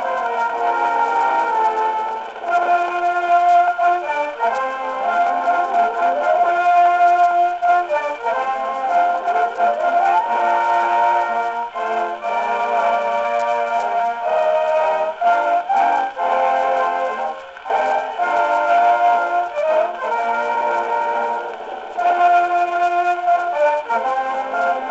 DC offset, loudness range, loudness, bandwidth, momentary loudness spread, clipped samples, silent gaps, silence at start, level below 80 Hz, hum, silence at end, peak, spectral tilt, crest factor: under 0.1%; 2 LU; -18 LUFS; 8 kHz; 7 LU; under 0.1%; none; 0 s; -62 dBFS; none; 0 s; -6 dBFS; -3 dB/octave; 12 dB